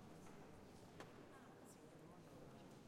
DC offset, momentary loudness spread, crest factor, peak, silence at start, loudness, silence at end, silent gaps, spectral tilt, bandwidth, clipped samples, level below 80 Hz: under 0.1%; 2 LU; 20 dB; -40 dBFS; 0 s; -62 LUFS; 0 s; none; -5.5 dB/octave; 16 kHz; under 0.1%; -78 dBFS